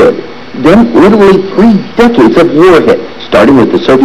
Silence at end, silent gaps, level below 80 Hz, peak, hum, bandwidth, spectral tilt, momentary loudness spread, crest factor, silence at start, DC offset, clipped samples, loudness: 0 s; none; -32 dBFS; 0 dBFS; none; 13 kHz; -7 dB/octave; 7 LU; 4 dB; 0 s; 2%; 9%; -5 LUFS